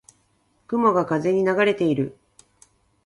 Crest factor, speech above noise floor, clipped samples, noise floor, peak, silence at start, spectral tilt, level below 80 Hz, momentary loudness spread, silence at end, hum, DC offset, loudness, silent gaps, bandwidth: 16 dB; 45 dB; under 0.1%; -65 dBFS; -6 dBFS; 0.7 s; -7 dB/octave; -64 dBFS; 8 LU; 0.95 s; none; under 0.1%; -21 LUFS; none; 11.5 kHz